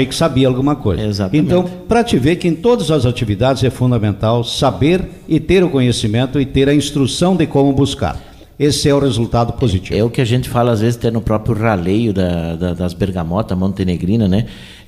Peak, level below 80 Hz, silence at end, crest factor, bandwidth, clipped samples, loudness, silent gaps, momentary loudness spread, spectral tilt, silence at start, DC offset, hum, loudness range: -2 dBFS; -34 dBFS; 0.05 s; 14 dB; 14.5 kHz; under 0.1%; -15 LUFS; none; 5 LU; -6.5 dB/octave; 0 s; under 0.1%; none; 2 LU